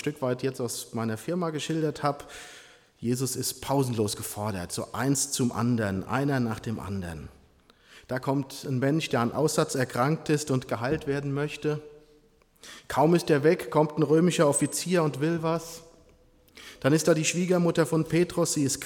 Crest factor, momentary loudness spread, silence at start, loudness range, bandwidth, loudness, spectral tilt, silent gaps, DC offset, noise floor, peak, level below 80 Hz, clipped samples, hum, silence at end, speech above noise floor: 18 dB; 11 LU; 0 s; 6 LU; 18 kHz; -27 LUFS; -5 dB/octave; none; under 0.1%; -61 dBFS; -10 dBFS; -58 dBFS; under 0.1%; none; 0 s; 34 dB